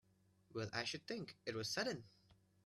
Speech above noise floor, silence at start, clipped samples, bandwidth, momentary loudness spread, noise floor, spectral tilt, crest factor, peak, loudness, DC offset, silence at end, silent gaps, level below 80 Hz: 29 dB; 0.5 s; under 0.1%; 14 kHz; 8 LU; -74 dBFS; -3.5 dB/octave; 22 dB; -26 dBFS; -45 LUFS; under 0.1%; 0.3 s; none; -80 dBFS